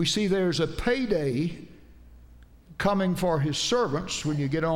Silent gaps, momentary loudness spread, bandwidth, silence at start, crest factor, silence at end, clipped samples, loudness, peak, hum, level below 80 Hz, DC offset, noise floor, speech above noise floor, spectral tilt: none; 5 LU; 16.5 kHz; 0 s; 14 dB; 0 s; under 0.1%; -26 LUFS; -12 dBFS; none; -46 dBFS; under 0.1%; -51 dBFS; 25 dB; -5 dB/octave